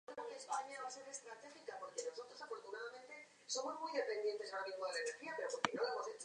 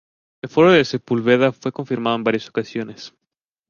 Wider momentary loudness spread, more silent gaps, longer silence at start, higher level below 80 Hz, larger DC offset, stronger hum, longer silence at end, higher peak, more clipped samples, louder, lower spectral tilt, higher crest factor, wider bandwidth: second, 12 LU vs 20 LU; neither; second, 0.1 s vs 0.45 s; second, under -90 dBFS vs -60 dBFS; neither; neither; second, 0 s vs 0.6 s; second, -16 dBFS vs -2 dBFS; neither; second, -45 LUFS vs -19 LUFS; second, -1.5 dB/octave vs -6 dB/octave; first, 30 dB vs 18 dB; first, 10.5 kHz vs 7.2 kHz